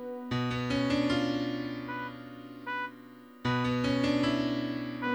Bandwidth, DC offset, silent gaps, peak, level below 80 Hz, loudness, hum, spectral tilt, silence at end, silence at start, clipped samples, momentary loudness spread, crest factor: over 20 kHz; under 0.1%; none; -16 dBFS; -56 dBFS; -31 LUFS; none; -6 dB/octave; 0 s; 0 s; under 0.1%; 13 LU; 16 dB